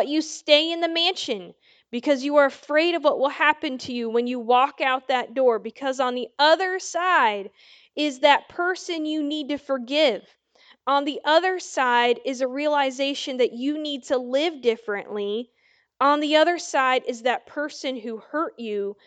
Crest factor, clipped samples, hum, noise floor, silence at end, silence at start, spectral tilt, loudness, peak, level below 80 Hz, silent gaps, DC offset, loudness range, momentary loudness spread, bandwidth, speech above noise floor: 22 dB; under 0.1%; none; -57 dBFS; 0.15 s; 0 s; -2 dB/octave; -23 LUFS; -2 dBFS; -76 dBFS; none; under 0.1%; 3 LU; 10 LU; 9.2 kHz; 34 dB